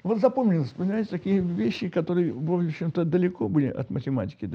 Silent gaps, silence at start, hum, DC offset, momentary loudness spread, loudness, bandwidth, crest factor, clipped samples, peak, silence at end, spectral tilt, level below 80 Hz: none; 0.05 s; none; under 0.1%; 5 LU; -26 LUFS; 6.8 kHz; 18 dB; under 0.1%; -8 dBFS; 0 s; -9.5 dB/octave; -60 dBFS